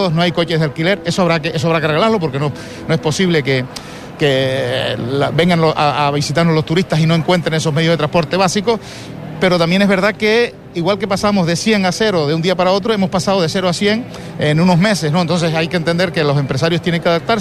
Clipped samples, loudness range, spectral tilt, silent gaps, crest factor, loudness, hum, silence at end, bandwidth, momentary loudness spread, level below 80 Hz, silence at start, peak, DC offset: under 0.1%; 2 LU; -5.5 dB/octave; none; 12 dB; -15 LUFS; none; 0 s; 13 kHz; 6 LU; -44 dBFS; 0 s; -2 dBFS; under 0.1%